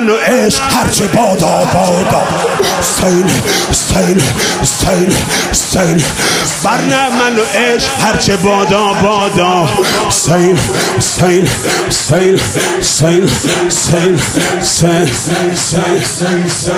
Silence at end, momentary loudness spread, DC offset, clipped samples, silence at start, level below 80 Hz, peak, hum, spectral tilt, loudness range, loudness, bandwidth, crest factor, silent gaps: 0 s; 2 LU; under 0.1%; under 0.1%; 0 s; -32 dBFS; 0 dBFS; none; -3.5 dB/octave; 1 LU; -10 LUFS; 16 kHz; 10 dB; none